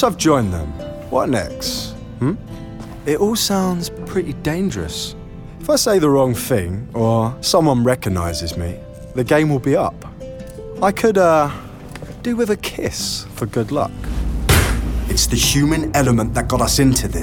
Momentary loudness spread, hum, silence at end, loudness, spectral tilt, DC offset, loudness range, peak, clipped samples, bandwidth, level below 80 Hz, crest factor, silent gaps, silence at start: 16 LU; none; 0 s; -18 LUFS; -4.5 dB/octave; under 0.1%; 4 LU; -2 dBFS; under 0.1%; 19 kHz; -30 dBFS; 16 dB; none; 0 s